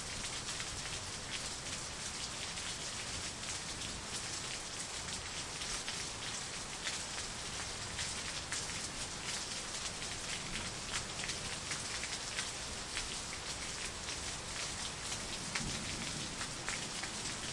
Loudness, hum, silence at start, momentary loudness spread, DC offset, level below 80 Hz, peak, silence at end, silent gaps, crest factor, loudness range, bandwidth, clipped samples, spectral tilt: -39 LUFS; none; 0 s; 2 LU; under 0.1%; -56 dBFS; -20 dBFS; 0 s; none; 22 dB; 1 LU; 11.5 kHz; under 0.1%; -1.5 dB/octave